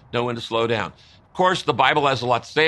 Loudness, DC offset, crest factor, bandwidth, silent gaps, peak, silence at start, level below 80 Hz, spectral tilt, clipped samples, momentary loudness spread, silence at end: -21 LUFS; under 0.1%; 20 dB; 12 kHz; none; -2 dBFS; 0.15 s; -58 dBFS; -4.5 dB/octave; under 0.1%; 8 LU; 0 s